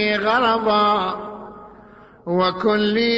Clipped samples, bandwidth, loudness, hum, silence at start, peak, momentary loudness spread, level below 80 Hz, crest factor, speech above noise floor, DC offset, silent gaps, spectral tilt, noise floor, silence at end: under 0.1%; 7.8 kHz; -19 LUFS; none; 0 s; -6 dBFS; 19 LU; -54 dBFS; 14 dB; 27 dB; under 0.1%; none; -6.5 dB/octave; -45 dBFS; 0 s